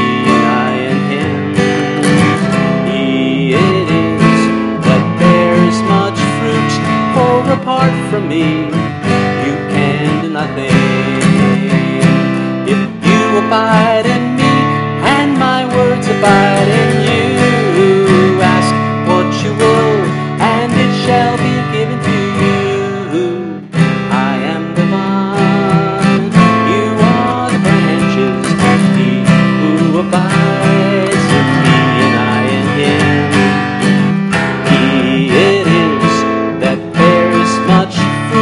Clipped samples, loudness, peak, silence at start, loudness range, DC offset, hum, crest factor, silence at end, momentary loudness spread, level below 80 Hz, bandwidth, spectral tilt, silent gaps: under 0.1%; -11 LUFS; 0 dBFS; 0 s; 3 LU; under 0.1%; none; 10 dB; 0 s; 5 LU; -44 dBFS; 11.5 kHz; -6 dB/octave; none